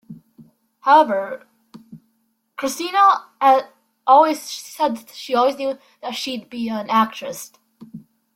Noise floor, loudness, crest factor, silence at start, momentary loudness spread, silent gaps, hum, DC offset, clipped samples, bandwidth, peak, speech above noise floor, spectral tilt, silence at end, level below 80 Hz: -68 dBFS; -19 LUFS; 18 dB; 0.1 s; 17 LU; none; none; under 0.1%; under 0.1%; 16.5 kHz; -2 dBFS; 49 dB; -3.5 dB/octave; 0.35 s; -70 dBFS